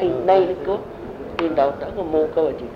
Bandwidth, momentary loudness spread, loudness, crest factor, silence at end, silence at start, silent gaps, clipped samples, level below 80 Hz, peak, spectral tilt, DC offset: 6.6 kHz; 12 LU; -21 LUFS; 18 dB; 0 s; 0 s; none; under 0.1%; -46 dBFS; -4 dBFS; -7.5 dB/octave; under 0.1%